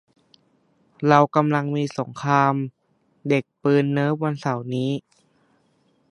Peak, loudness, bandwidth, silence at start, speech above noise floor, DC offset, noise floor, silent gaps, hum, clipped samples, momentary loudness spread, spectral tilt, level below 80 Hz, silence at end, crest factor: 0 dBFS; -22 LUFS; 10.5 kHz; 1 s; 43 dB; under 0.1%; -64 dBFS; none; none; under 0.1%; 11 LU; -7.5 dB/octave; -68 dBFS; 1.1 s; 22 dB